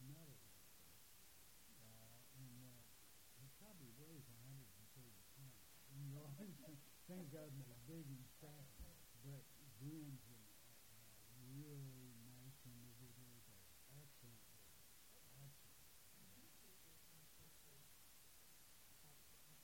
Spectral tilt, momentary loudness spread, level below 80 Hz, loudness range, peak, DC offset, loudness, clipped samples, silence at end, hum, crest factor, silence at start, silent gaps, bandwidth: -4.5 dB/octave; 9 LU; -78 dBFS; 7 LU; -44 dBFS; under 0.1%; -61 LUFS; under 0.1%; 0 s; none; 18 dB; 0 s; none; 16.5 kHz